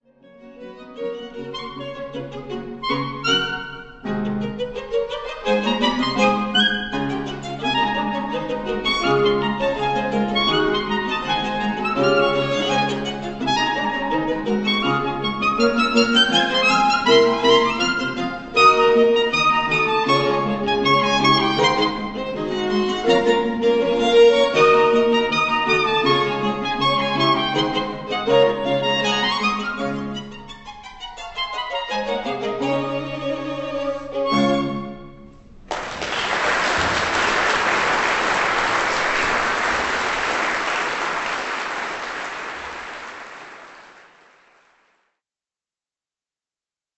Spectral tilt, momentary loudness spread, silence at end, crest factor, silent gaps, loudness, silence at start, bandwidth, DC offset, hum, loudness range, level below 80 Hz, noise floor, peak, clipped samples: -4 dB/octave; 15 LU; 3.05 s; 18 dB; none; -19 LUFS; 0.4 s; 8.4 kHz; under 0.1%; none; 9 LU; -46 dBFS; under -90 dBFS; -2 dBFS; under 0.1%